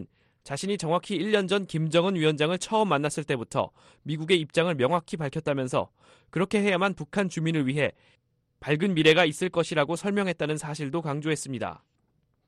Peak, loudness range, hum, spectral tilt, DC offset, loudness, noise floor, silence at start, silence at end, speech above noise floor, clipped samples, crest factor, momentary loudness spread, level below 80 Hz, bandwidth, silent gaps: -8 dBFS; 3 LU; none; -5 dB/octave; under 0.1%; -26 LUFS; -71 dBFS; 0 s; 0.7 s; 45 dB; under 0.1%; 20 dB; 10 LU; -64 dBFS; 12.5 kHz; none